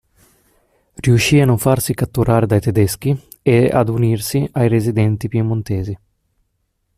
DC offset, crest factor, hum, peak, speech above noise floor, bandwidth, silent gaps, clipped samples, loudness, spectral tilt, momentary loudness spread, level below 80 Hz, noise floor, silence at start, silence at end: under 0.1%; 14 dB; none; -2 dBFS; 53 dB; 15 kHz; none; under 0.1%; -16 LUFS; -6.5 dB/octave; 8 LU; -42 dBFS; -68 dBFS; 1 s; 1 s